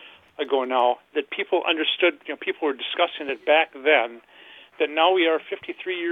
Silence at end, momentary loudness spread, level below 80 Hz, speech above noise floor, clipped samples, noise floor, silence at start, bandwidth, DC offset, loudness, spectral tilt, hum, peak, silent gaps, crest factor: 0 s; 10 LU; -74 dBFS; 25 dB; under 0.1%; -48 dBFS; 0 s; 4.3 kHz; under 0.1%; -23 LUFS; -4.5 dB/octave; none; -4 dBFS; none; 20 dB